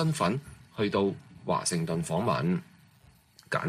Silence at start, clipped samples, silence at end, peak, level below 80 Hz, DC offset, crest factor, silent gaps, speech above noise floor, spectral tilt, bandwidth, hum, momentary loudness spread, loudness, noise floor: 0 s; under 0.1%; 0 s; -14 dBFS; -60 dBFS; under 0.1%; 18 dB; none; 31 dB; -5.5 dB/octave; 15 kHz; none; 8 LU; -30 LUFS; -60 dBFS